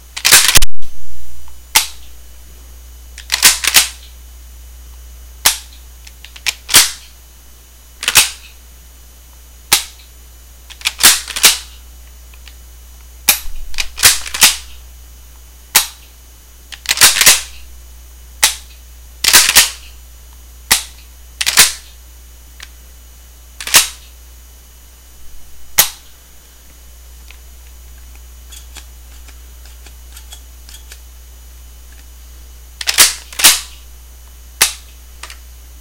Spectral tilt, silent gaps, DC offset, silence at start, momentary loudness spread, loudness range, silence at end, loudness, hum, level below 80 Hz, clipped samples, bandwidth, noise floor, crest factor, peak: 1 dB/octave; none; under 0.1%; 0.15 s; 25 LU; 7 LU; 0.5 s; -10 LUFS; none; -34 dBFS; 1%; over 20 kHz; -40 dBFS; 16 dB; 0 dBFS